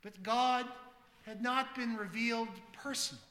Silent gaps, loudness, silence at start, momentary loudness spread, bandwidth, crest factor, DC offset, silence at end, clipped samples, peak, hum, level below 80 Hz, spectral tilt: none; -36 LUFS; 0.05 s; 15 LU; 16 kHz; 18 dB; under 0.1%; 0.05 s; under 0.1%; -18 dBFS; none; -76 dBFS; -2.5 dB/octave